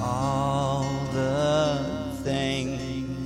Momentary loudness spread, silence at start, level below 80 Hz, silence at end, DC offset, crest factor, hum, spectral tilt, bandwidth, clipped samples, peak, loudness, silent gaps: 8 LU; 0 s; -44 dBFS; 0 s; under 0.1%; 12 dB; none; -6 dB/octave; 15 kHz; under 0.1%; -14 dBFS; -26 LUFS; none